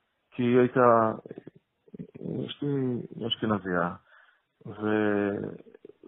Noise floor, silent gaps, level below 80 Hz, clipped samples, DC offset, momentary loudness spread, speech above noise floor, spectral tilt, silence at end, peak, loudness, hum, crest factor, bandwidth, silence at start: -61 dBFS; none; -68 dBFS; under 0.1%; under 0.1%; 24 LU; 34 dB; -5 dB/octave; 0.5 s; -6 dBFS; -27 LUFS; none; 22 dB; 3.9 kHz; 0.35 s